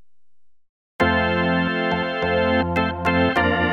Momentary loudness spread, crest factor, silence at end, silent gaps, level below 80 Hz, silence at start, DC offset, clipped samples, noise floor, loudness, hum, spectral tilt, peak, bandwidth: 4 LU; 16 dB; 0 s; 0.69-0.99 s; -42 dBFS; 0 s; under 0.1%; under 0.1%; -76 dBFS; -20 LUFS; none; -7 dB/octave; -6 dBFS; 8.6 kHz